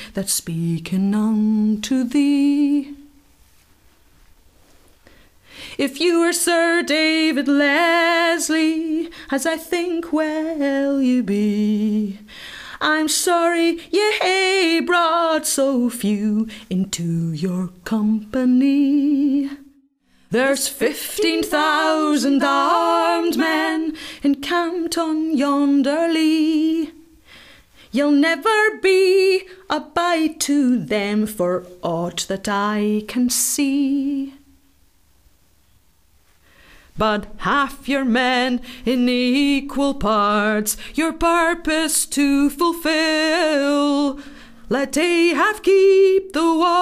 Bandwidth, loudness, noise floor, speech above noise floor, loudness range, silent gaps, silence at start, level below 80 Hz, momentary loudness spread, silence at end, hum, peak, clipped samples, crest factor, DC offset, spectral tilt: 16 kHz; -18 LUFS; -58 dBFS; 40 dB; 5 LU; none; 0 s; -48 dBFS; 8 LU; 0 s; none; -4 dBFS; under 0.1%; 14 dB; under 0.1%; -4 dB/octave